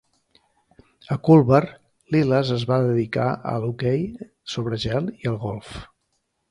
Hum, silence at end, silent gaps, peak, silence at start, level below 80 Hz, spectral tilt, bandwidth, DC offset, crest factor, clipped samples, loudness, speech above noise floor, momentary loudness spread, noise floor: none; 0.65 s; none; -2 dBFS; 1.1 s; -50 dBFS; -8 dB/octave; 11 kHz; under 0.1%; 20 dB; under 0.1%; -22 LUFS; 52 dB; 17 LU; -73 dBFS